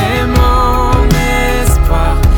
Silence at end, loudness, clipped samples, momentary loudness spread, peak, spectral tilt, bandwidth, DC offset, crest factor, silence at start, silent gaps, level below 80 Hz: 0 s; -11 LUFS; under 0.1%; 2 LU; 0 dBFS; -5.5 dB/octave; 19.5 kHz; under 0.1%; 8 dB; 0 s; none; -12 dBFS